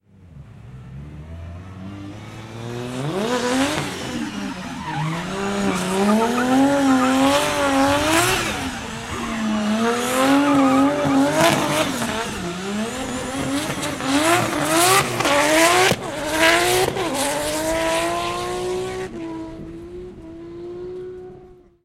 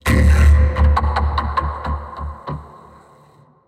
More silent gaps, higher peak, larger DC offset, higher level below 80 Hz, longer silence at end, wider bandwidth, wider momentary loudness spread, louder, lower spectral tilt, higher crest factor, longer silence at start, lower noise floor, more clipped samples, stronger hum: neither; first, 0 dBFS vs -4 dBFS; neither; second, -46 dBFS vs -18 dBFS; second, 0.3 s vs 1 s; first, 16 kHz vs 12 kHz; about the same, 20 LU vs 18 LU; about the same, -19 LUFS vs -17 LUFS; second, -3.5 dB/octave vs -6.5 dB/octave; first, 20 dB vs 14 dB; first, 0.2 s vs 0.05 s; second, -45 dBFS vs -50 dBFS; neither; neither